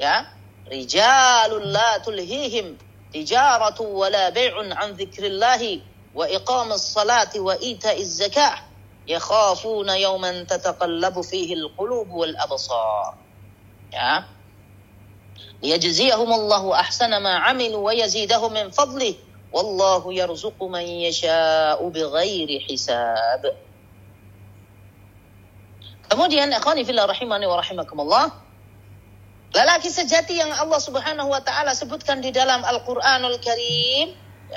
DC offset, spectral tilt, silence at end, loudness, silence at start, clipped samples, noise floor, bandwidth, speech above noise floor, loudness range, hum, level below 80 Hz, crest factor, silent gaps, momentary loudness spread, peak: under 0.1%; -2 dB/octave; 0 s; -20 LUFS; 0 s; under 0.1%; -48 dBFS; 16 kHz; 28 dB; 6 LU; none; -58 dBFS; 20 dB; none; 10 LU; -2 dBFS